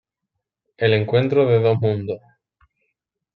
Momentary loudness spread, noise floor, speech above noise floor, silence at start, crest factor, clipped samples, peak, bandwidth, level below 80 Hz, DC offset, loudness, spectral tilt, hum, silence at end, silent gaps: 11 LU; -80 dBFS; 63 dB; 0.8 s; 18 dB; under 0.1%; -4 dBFS; 4.8 kHz; -64 dBFS; under 0.1%; -19 LUFS; -9.5 dB/octave; none; 1.2 s; none